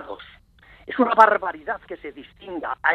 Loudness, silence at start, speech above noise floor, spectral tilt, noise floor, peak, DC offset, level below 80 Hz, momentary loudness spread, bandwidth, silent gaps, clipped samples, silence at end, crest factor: -20 LUFS; 0 s; 30 dB; -5 dB/octave; -51 dBFS; 0 dBFS; under 0.1%; -58 dBFS; 24 LU; 8.8 kHz; none; under 0.1%; 0 s; 22 dB